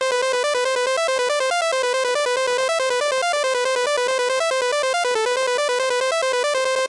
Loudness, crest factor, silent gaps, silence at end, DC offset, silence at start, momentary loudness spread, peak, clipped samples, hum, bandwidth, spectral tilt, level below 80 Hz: -20 LUFS; 8 dB; none; 0 s; under 0.1%; 0 s; 0 LU; -12 dBFS; under 0.1%; none; 11.5 kHz; 1.5 dB/octave; -70 dBFS